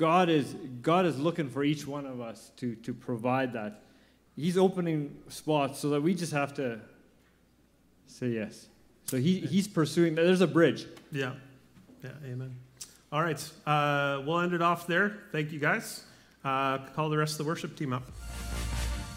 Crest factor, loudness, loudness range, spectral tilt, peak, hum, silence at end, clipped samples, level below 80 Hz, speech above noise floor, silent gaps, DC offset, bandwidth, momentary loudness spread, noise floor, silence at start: 20 dB; -30 LUFS; 6 LU; -5.5 dB/octave; -10 dBFS; none; 0 s; under 0.1%; -50 dBFS; 35 dB; none; under 0.1%; 16 kHz; 15 LU; -65 dBFS; 0 s